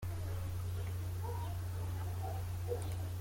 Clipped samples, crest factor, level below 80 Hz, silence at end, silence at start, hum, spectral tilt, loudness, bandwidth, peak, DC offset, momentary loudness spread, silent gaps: under 0.1%; 14 dB; -52 dBFS; 0 s; 0 s; none; -6 dB/octave; -41 LUFS; 16.5 kHz; -26 dBFS; under 0.1%; 1 LU; none